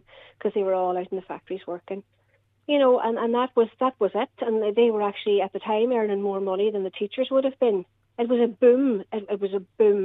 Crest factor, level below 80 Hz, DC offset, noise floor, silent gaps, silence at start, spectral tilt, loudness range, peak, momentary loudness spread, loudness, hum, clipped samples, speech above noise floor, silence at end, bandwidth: 16 dB; -76 dBFS; under 0.1%; -66 dBFS; none; 0.45 s; -8.5 dB/octave; 2 LU; -8 dBFS; 14 LU; -24 LUFS; none; under 0.1%; 43 dB; 0 s; 4 kHz